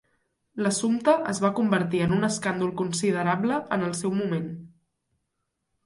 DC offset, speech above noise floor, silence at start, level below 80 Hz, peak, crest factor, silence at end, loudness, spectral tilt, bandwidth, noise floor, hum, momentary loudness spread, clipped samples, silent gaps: under 0.1%; 55 dB; 0.55 s; -62 dBFS; -8 dBFS; 18 dB; 1.2 s; -25 LUFS; -5.5 dB/octave; 11.5 kHz; -79 dBFS; none; 6 LU; under 0.1%; none